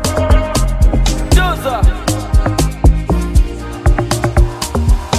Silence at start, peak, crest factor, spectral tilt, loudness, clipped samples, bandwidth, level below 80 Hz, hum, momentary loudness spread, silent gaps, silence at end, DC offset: 0 s; 0 dBFS; 12 dB; -5.5 dB/octave; -15 LUFS; under 0.1%; 15.5 kHz; -14 dBFS; none; 3 LU; none; 0 s; under 0.1%